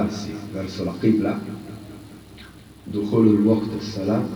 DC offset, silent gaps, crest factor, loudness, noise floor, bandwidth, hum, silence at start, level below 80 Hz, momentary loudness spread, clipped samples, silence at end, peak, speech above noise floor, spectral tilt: under 0.1%; none; 18 dB; -22 LUFS; -44 dBFS; 19.5 kHz; none; 0 s; -54 dBFS; 25 LU; under 0.1%; 0 s; -4 dBFS; 22 dB; -7.5 dB/octave